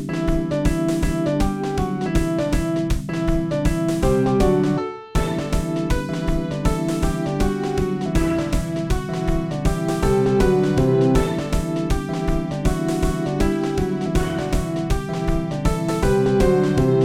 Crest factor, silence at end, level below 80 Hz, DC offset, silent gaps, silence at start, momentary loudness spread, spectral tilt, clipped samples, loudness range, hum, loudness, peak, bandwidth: 16 dB; 0 s; -26 dBFS; 0.3%; none; 0 s; 6 LU; -7 dB/octave; under 0.1%; 3 LU; none; -21 LUFS; -4 dBFS; 16.5 kHz